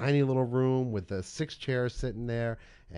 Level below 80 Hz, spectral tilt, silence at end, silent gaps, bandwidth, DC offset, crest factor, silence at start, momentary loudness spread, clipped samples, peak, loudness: -48 dBFS; -7 dB/octave; 0 s; none; 11 kHz; under 0.1%; 16 dB; 0 s; 10 LU; under 0.1%; -14 dBFS; -31 LUFS